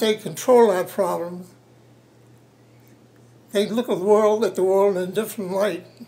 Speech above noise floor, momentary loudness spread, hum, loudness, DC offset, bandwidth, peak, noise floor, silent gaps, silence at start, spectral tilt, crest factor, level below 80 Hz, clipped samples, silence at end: 32 dB; 11 LU; none; -21 LUFS; under 0.1%; 16 kHz; -4 dBFS; -52 dBFS; none; 0 s; -5 dB/octave; 18 dB; -74 dBFS; under 0.1%; 0.05 s